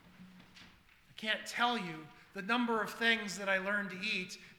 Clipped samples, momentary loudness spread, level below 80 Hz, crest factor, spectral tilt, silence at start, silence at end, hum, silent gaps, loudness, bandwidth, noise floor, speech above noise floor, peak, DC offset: under 0.1%; 14 LU; -74 dBFS; 22 dB; -3 dB/octave; 0.05 s; 0.05 s; none; none; -34 LUFS; 19.5 kHz; -63 dBFS; 27 dB; -14 dBFS; under 0.1%